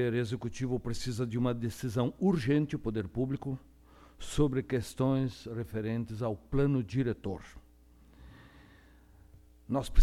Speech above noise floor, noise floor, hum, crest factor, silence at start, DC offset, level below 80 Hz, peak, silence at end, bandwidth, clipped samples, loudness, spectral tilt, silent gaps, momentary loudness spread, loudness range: 28 dB; -59 dBFS; none; 22 dB; 0 s; under 0.1%; -50 dBFS; -10 dBFS; 0 s; 14.5 kHz; under 0.1%; -33 LUFS; -7 dB/octave; none; 9 LU; 4 LU